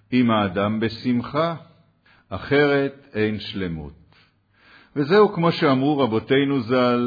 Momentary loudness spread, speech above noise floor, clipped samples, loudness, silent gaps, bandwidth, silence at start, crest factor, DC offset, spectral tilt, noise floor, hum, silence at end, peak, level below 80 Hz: 14 LU; 38 dB; under 0.1%; -21 LUFS; none; 5 kHz; 0.1 s; 18 dB; under 0.1%; -8.5 dB/octave; -58 dBFS; none; 0 s; -4 dBFS; -54 dBFS